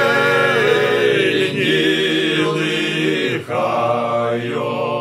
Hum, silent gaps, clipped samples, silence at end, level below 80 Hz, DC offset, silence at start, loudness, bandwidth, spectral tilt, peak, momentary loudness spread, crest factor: none; none; under 0.1%; 0 s; -64 dBFS; under 0.1%; 0 s; -16 LUFS; 15.5 kHz; -5 dB/octave; -2 dBFS; 6 LU; 14 dB